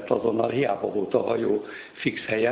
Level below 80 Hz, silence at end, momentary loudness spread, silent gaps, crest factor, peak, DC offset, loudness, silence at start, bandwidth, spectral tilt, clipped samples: -62 dBFS; 0 s; 5 LU; none; 18 dB; -8 dBFS; under 0.1%; -26 LUFS; 0 s; 4 kHz; -10 dB/octave; under 0.1%